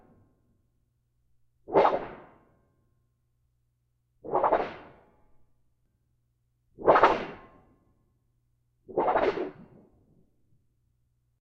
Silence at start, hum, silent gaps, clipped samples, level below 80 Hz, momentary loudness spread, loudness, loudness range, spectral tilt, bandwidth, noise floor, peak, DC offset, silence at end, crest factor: 1.7 s; none; none; under 0.1%; -60 dBFS; 20 LU; -26 LUFS; 6 LU; -6.5 dB/octave; 7.4 kHz; -74 dBFS; -4 dBFS; under 0.1%; 1.9 s; 26 dB